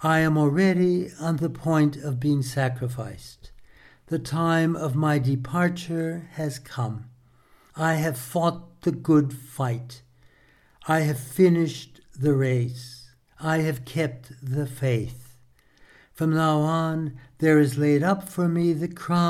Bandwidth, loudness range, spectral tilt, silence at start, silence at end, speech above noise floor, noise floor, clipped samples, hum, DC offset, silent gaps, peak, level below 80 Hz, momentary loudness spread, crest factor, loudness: 15.5 kHz; 5 LU; -7 dB/octave; 0 s; 0 s; 35 dB; -59 dBFS; under 0.1%; none; under 0.1%; none; -8 dBFS; -56 dBFS; 11 LU; 18 dB; -24 LUFS